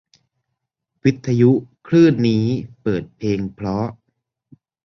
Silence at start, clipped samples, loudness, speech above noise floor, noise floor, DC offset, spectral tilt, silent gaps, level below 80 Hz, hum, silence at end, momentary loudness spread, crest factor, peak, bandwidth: 1.05 s; under 0.1%; -19 LUFS; 61 dB; -78 dBFS; under 0.1%; -8 dB/octave; none; -50 dBFS; none; 0.9 s; 10 LU; 18 dB; -2 dBFS; 6.8 kHz